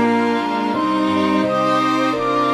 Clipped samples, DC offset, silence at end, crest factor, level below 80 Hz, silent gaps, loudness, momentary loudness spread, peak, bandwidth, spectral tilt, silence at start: under 0.1%; under 0.1%; 0 s; 12 dB; -54 dBFS; none; -18 LUFS; 3 LU; -6 dBFS; 12.5 kHz; -5.5 dB/octave; 0 s